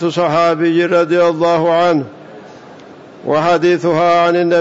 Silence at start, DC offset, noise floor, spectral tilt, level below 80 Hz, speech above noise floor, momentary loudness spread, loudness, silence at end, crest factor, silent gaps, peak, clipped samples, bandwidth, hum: 0 s; under 0.1%; -37 dBFS; -6.5 dB/octave; -60 dBFS; 24 dB; 5 LU; -13 LUFS; 0 s; 10 dB; none; -4 dBFS; under 0.1%; 7.8 kHz; none